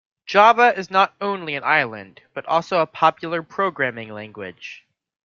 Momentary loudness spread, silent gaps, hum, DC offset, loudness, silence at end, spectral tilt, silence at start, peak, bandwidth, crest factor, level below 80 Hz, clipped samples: 20 LU; none; none; under 0.1%; -19 LUFS; 0.5 s; -4.5 dB/octave; 0.3 s; -2 dBFS; 7.2 kHz; 18 dB; -68 dBFS; under 0.1%